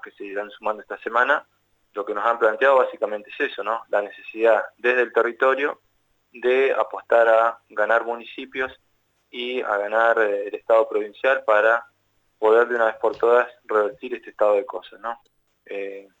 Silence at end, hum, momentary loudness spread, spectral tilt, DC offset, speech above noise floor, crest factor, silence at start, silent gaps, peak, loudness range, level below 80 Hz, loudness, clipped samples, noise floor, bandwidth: 0.2 s; 50 Hz at -75 dBFS; 15 LU; -4 dB/octave; under 0.1%; 45 dB; 16 dB; 0.05 s; none; -6 dBFS; 3 LU; -72 dBFS; -21 LUFS; under 0.1%; -67 dBFS; 7.8 kHz